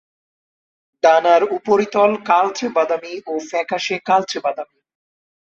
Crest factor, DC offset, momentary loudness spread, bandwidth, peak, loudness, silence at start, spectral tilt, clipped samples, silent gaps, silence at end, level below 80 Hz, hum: 16 dB; under 0.1%; 11 LU; 7.6 kHz; -2 dBFS; -18 LUFS; 1.05 s; -4 dB/octave; under 0.1%; none; 0.85 s; -66 dBFS; none